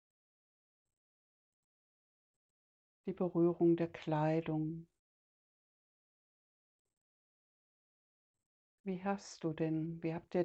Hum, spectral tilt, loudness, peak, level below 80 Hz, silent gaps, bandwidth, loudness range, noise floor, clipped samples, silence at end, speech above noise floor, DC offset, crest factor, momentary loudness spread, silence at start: none; -8 dB/octave; -37 LUFS; -22 dBFS; -76 dBFS; 4.99-6.85 s, 6.97-8.34 s, 8.46-8.84 s; 8.2 kHz; 13 LU; under -90 dBFS; under 0.1%; 0 s; over 54 dB; under 0.1%; 20 dB; 13 LU; 3.05 s